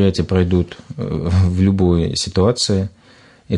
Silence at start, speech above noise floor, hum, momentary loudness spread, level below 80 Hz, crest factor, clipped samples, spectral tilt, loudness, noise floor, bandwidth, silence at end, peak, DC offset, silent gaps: 0 s; 31 dB; none; 10 LU; -40 dBFS; 14 dB; under 0.1%; -6 dB/octave; -17 LUFS; -48 dBFS; 10.5 kHz; 0 s; -2 dBFS; under 0.1%; none